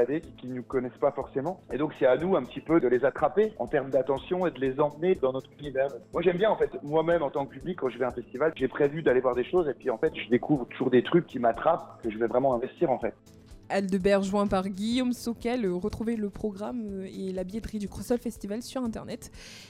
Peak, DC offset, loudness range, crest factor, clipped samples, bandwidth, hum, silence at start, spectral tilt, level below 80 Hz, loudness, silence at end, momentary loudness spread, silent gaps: -10 dBFS; under 0.1%; 5 LU; 16 dB; under 0.1%; 15 kHz; none; 0 s; -6.5 dB/octave; -54 dBFS; -28 LUFS; 0 s; 10 LU; none